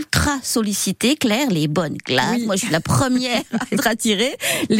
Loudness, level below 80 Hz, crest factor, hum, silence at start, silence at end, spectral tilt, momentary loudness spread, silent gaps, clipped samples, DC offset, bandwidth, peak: -19 LUFS; -42 dBFS; 16 dB; none; 0 s; 0 s; -4 dB/octave; 3 LU; none; under 0.1%; under 0.1%; 16.5 kHz; -4 dBFS